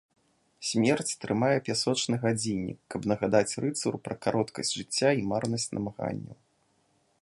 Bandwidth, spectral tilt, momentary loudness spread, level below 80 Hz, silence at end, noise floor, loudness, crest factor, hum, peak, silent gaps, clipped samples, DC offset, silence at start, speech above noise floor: 11.5 kHz; -4.5 dB/octave; 9 LU; -62 dBFS; 0.9 s; -70 dBFS; -29 LUFS; 20 dB; none; -10 dBFS; none; under 0.1%; under 0.1%; 0.6 s; 41 dB